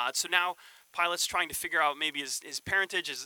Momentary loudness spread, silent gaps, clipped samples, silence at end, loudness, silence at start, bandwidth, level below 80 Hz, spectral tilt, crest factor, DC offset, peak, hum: 7 LU; none; under 0.1%; 0 s; -29 LUFS; 0 s; 19.5 kHz; -66 dBFS; 0 dB/octave; 22 dB; under 0.1%; -10 dBFS; none